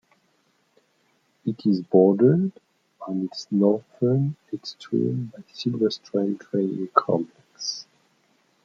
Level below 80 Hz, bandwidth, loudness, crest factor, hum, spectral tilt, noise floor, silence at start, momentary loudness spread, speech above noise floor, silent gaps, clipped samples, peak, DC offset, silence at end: -72 dBFS; 7.4 kHz; -24 LUFS; 22 dB; none; -7 dB/octave; -67 dBFS; 1.45 s; 15 LU; 44 dB; none; under 0.1%; -2 dBFS; under 0.1%; 0.85 s